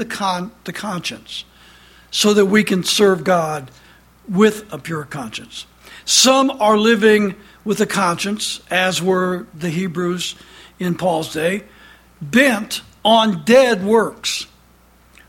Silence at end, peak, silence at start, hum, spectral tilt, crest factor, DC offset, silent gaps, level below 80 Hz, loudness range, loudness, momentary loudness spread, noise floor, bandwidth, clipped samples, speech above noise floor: 0.85 s; 0 dBFS; 0 s; none; -3.5 dB/octave; 18 dB; under 0.1%; none; -54 dBFS; 5 LU; -17 LUFS; 16 LU; -51 dBFS; 17 kHz; under 0.1%; 34 dB